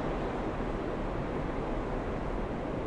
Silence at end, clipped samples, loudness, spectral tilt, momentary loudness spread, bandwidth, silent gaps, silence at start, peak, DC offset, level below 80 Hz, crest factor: 0 s; under 0.1%; -35 LUFS; -7.5 dB/octave; 1 LU; 10 kHz; none; 0 s; -20 dBFS; under 0.1%; -40 dBFS; 14 dB